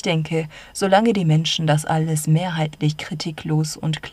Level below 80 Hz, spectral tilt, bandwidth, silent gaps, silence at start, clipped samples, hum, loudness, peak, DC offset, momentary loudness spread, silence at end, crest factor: -54 dBFS; -5.5 dB/octave; 13.5 kHz; none; 0.05 s; under 0.1%; none; -20 LUFS; -2 dBFS; under 0.1%; 9 LU; 0 s; 18 dB